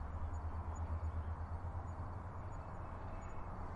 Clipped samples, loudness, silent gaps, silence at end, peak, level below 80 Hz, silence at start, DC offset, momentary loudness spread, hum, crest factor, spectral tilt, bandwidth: under 0.1%; -46 LUFS; none; 0 s; -32 dBFS; -48 dBFS; 0 s; under 0.1%; 6 LU; none; 12 dB; -8 dB/octave; 7.4 kHz